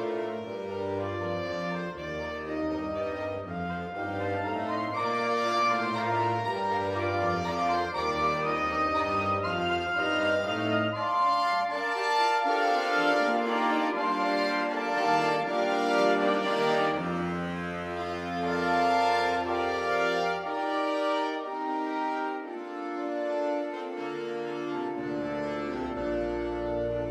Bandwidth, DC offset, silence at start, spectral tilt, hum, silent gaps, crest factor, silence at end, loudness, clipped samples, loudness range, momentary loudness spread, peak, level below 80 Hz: 15.5 kHz; under 0.1%; 0 s; -5.5 dB/octave; none; none; 16 dB; 0 s; -29 LUFS; under 0.1%; 7 LU; 9 LU; -12 dBFS; -56 dBFS